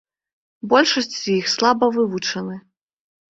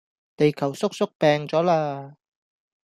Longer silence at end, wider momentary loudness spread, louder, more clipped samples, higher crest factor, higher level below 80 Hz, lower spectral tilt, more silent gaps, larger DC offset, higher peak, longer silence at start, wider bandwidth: about the same, 0.75 s vs 0.75 s; first, 15 LU vs 6 LU; first, -19 LUFS vs -23 LUFS; neither; about the same, 20 dB vs 18 dB; about the same, -64 dBFS vs -66 dBFS; second, -3.5 dB/octave vs -6 dB/octave; second, none vs 1.15-1.20 s; neither; first, -2 dBFS vs -6 dBFS; first, 0.65 s vs 0.4 s; second, 7.8 kHz vs 14 kHz